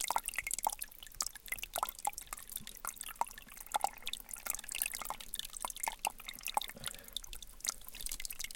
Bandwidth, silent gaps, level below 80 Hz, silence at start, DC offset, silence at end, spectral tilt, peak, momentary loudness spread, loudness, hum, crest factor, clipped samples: 17 kHz; none; -56 dBFS; 0 s; under 0.1%; 0 s; 0.5 dB/octave; -12 dBFS; 8 LU; -40 LUFS; none; 28 dB; under 0.1%